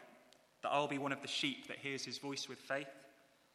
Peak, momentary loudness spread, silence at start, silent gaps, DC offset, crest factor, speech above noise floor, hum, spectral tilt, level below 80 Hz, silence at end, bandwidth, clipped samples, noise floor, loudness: -20 dBFS; 8 LU; 0 s; none; under 0.1%; 22 dB; 26 dB; none; -3 dB/octave; -90 dBFS; 0.45 s; 14.5 kHz; under 0.1%; -67 dBFS; -40 LUFS